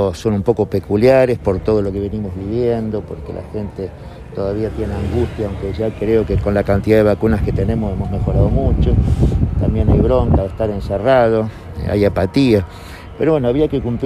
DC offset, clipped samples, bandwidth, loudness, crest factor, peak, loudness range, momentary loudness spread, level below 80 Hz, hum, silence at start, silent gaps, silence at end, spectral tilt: under 0.1%; under 0.1%; 14 kHz; -17 LUFS; 14 dB; 0 dBFS; 6 LU; 13 LU; -24 dBFS; none; 0 s; none; 0 s; -8.5 dB/octave